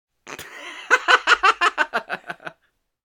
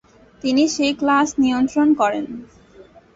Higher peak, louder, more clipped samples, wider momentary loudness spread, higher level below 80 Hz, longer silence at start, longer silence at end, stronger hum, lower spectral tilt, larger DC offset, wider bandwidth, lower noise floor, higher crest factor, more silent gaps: first, 0 dBFS vs -6 dBFS; about the same, -18 LUFS vs -18 LUFS; neither; first, 21 LU vs 11 LU; second, -62 dBFS vs -54 dBFS; second, 0.25 s vs 0.45 s; first, 0.55 s vs 0.35 s; neither; second, -0.5 dB/octave vs -3.5 dB/octave; neither; first, 19.5 kHz vs 8 kHz; first, -69 dBFS vs -47 dBFS; first, 22 dB vs 14 dB; neither